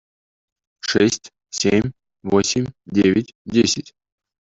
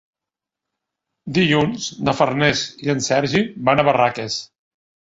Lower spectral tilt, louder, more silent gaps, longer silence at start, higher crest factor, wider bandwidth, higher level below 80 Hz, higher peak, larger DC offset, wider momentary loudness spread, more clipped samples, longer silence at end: about the same, -4.5 dB/octave vs -4.5 dB/octave; about the same, -20 LUFS vs -19 LUFS; first, 3.35-3.45 s vs none; second, 0.85 s vs 1.25 s; about the same, 18 dB vs 20 dB; about the same, 8 kHz vs 8 kHz; about the same, -52 dBFS vs -52 dBFS; about the same, -2 dBFS vs -2 dBFS; neither; about the same, 11 LU vs 9 LU; neither; about the same, 0.65 s vs 0.7 s